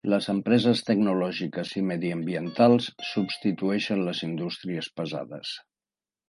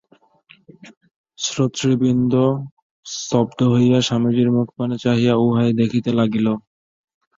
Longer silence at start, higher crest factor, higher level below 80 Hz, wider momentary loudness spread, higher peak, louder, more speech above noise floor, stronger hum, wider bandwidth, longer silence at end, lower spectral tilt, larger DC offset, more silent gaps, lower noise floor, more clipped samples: second, 0.05 s vs 0.85 s; about the same, 18 dB vs 16 dB; second, -68 dBFS vs -56 dBFS; about the same, 11 LU vs 9 LU; second, -8 dBFS vs -4 dBFS; second, -26 LUFS vs -18 LUFS; first, over 64 dB vs 36 dB; neither; first, 11.5 kHz vs 7.8 kHz; about the same, 0.7 s vs 0.8 s; about the same, -6.5 dB/octave vs -6 dB/octave; neither; second, none vs 0.97-1.01 s, 1.16-1.24 s, 2.71-3.03 s; first, under -90 dBFS vs -53 dBFS; neither